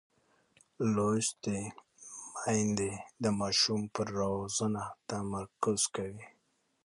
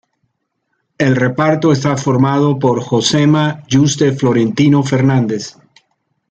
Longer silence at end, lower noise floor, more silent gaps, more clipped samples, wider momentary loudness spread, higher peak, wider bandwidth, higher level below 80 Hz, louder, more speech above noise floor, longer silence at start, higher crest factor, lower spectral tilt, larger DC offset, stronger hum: second, 0.6 s vs 0.8 s; about the same, -69 dBFS vs -69 dBFS; neither; neither; first, 14 LU vs 4 LU; second, -16 dBFS vs 0 dBFS; first, 11.5 kHz vs 9 kHz; second, -62 dBFS vs -52 dBFS; second, -33 LUFS vs -13 LUFS; second, 36 dB vs 56 dB; second, 0.8 s vs 1 s; first, 20 dB vs 14 dB; second, -4 dB/octave vs -6 dB/octave; neither; neither